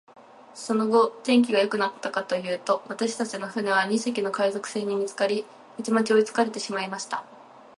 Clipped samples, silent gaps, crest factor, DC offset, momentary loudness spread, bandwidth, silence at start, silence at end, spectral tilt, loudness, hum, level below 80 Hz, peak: under 0.1%; none; 18 dB; under 0.1%; 10 LU; 11.5 kHz; 0.2 s; 0.15 s; -4 dB/octave; -25 LUFS; none; -76 dBFS; -8 dBFS